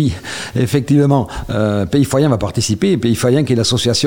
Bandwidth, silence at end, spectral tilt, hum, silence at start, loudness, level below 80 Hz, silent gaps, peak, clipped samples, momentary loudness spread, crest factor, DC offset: 17 kHz; 0 s; -5.5 dB/octave; none; 0 s; -15 LUFS; -36 dBFS; none; -2 dBFS; under 0.1%; 6 LU; 12 dB; under 0.1%